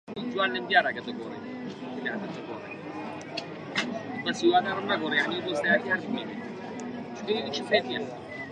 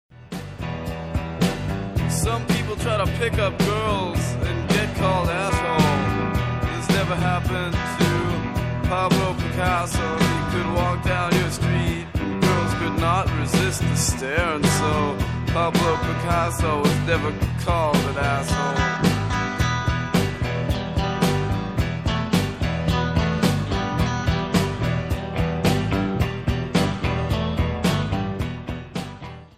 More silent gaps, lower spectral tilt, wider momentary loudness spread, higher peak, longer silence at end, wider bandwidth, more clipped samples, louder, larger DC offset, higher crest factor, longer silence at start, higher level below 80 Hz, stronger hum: neither; about the same, -4.5 dB/octave vs -5.5 dB/octave; first, 14 LU vs 5 LU; second, -8 dBFS vs -4 dBFS; about the same, 0 s vs 0.1 s; second, 11 kHz vs 15 kHz; neither; second, -29 LUFS vs -22 LUFS; second, under 0.1% vs 0.1%; about the same, 22 dB vs 18 dB; about the same, 0.05 s vs 0.15 s; second, -70 dBFS vs -34 dBFS; neither